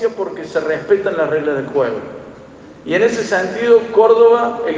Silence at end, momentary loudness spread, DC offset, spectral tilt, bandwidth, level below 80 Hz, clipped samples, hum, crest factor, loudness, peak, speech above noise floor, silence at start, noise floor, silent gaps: 0 s; 14 LU; under 0.1%; -5 dB/octave; 7.6 kHz; -56 dBFS; under 0.1%; none; 14 dB; -15 LUFS; 0 dBFS; 23 dB; 0 s; -38 dBFS; none